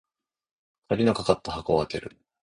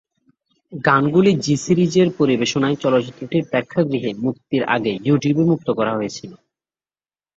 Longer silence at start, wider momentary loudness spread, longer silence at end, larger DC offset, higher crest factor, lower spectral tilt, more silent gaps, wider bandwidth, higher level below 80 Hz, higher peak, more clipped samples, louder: first, 0.9 s vs 0.7 s; first, 11 LU vs 8 LU; second, 0.35 s vs 1 s; neither; first, 24 dB vs 18 dB; about the same, -6 dB/octave vs -6 dB/octave; neither; first, 11 kHz vs 8 kHz; first, -52 dBFS vs -58 dBFS; about the same, -4 dBFS vs -2 dBFS; neither; second, -26 LUFS vs -18 LUFS